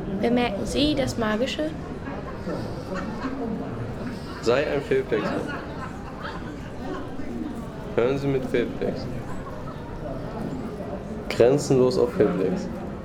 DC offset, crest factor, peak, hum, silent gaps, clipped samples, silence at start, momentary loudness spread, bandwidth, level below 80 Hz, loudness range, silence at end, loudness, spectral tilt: under 0.1%; 20 dB; -6 dBFS; none; none; under 0.1%; 0 s; 13 LU; 16 kHz; -42 dBFS; 6 LU; 0 s; -26 LUFS; -6 dB/octave